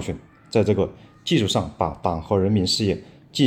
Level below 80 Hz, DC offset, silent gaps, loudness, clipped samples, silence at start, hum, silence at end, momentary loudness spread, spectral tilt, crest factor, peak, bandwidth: -48 dBFS; under 0.1%; none; -23 LUFS; under 0.1%; 0 s; none; 0 s; 12 LU; -5.5 dB/octave; 18 dB; -4 dBFS; 15.5 kHz